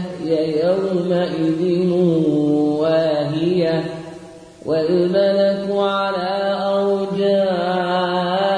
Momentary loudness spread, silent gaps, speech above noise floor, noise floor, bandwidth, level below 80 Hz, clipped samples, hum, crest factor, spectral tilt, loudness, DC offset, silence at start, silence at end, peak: 5 LU; none; 21 dB; -39 dBFS; 10.5 kHz; -58 dBFS; under 0.1%; none; 12 dB; -7.5 dB/octave; -18 LUFS; under 0.1%; 0 s; 0 s; -6 dBFS